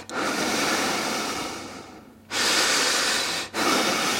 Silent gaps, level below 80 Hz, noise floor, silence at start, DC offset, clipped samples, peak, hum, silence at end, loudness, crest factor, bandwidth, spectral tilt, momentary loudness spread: none; -60 dBFS; -45 dBFS; 0 s; under 0.1%; under 0.1%; -8 dBFS; none; 0 s; -23 LUFS; 16 dB; 16.5 kHz; -1 dB/octave; 12 LU